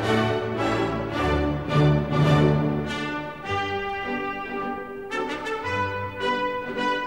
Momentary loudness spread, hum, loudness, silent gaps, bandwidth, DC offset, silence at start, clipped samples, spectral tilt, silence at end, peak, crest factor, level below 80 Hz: 9 LU; none; -25 LUFS; none; 10.5 kHz; 0.2%; 0 s; under 0.1%; -7 dB/octave; 0 s; -6 dBFS; 18 dB; -40 dBFS